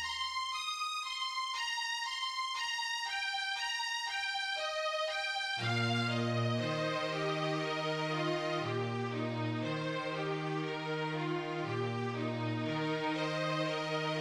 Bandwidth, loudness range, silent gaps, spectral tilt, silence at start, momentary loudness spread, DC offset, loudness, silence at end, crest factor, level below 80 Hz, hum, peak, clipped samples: 13.5 kHz; 3 LU; none; -4.5 dB/octave; 0 s; 3 LU; under 0.1%; -35 LUFS; 0 s; 14 dB; -74 dBFS; none; -20 dBFS; under 0.1%